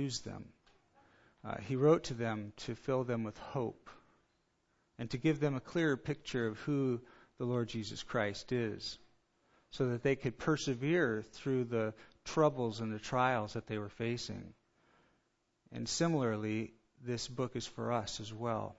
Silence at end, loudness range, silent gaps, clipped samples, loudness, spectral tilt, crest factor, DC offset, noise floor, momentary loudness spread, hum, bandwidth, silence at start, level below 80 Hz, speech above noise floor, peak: 0.05 s; 4 LU; none; under 0.1%; -36 LUFS; -5.5 dB/octave; 20 dB; under 0.1%; -79 dBFS; 12 LU; none; 7.6 kHz; 0 s; -64 dBFS; 43 dB; -16 dBFS